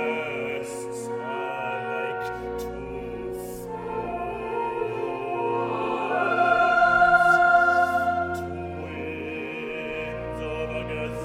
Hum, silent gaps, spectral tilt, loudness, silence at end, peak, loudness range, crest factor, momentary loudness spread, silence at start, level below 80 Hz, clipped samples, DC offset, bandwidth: none; none; -5.5 dB/octave; -25 LUFS; 0 s; -6 dBFS; 11 LU; 18 dB; 16 LU; 0 s; -48 dBFS; under 0.1%; under 0.1%; 16 kHz